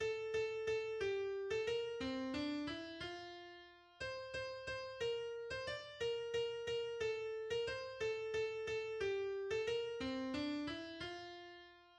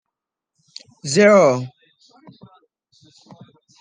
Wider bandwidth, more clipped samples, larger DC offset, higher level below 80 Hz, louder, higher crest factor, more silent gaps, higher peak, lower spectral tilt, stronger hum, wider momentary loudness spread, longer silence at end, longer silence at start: about the same, 9.8 kHz vs 10 kHz; neither; neither; about the same, -68 dBFS vs -72 dBFS; second, -43 LUFS vs -15 LUFS; about the same, 14 dB vs 18 dB; neither; second, -30 dBFS vs -2 dBFS; about the same, -4.5 dB/octave vs -5 dB/octave; neither; second, 8 LU vs 21 LU; second, 0 s vs 2.1 s; second, 0 s vs 1.05 s